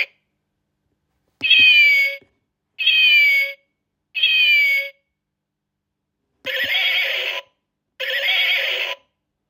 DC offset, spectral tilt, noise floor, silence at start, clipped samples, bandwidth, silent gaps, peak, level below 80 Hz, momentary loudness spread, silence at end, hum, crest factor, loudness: under 0.1%; 0.5 dB/octave; -80 dBFS; 0 s; under 0.1%; 16 kHz; none; -2 dBFS; -72 dBFS; 18 LU; 0.55 s; none; 18 dB; -14 LUFS